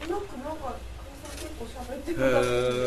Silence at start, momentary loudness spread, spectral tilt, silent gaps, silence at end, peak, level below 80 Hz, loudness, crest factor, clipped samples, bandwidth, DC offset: 0 s; 17 LU; -5 dB/octave; none; 0 s; -10 dBFS; -44 dBFS; -30 LUFS; 18 dB; under 0.1%; 14 kHz; under 0.1%